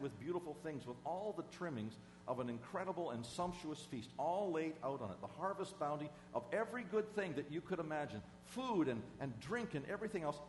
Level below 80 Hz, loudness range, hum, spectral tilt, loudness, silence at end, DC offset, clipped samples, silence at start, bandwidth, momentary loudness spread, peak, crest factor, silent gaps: -72 dBFS; 3 LU; none; -6 dB/octave; -44 LUFS; 0 s; under 0.1%; under 0.1%; 0 s; 11.5 kHz; 8 LU; -26 dBFS; 18 dB; none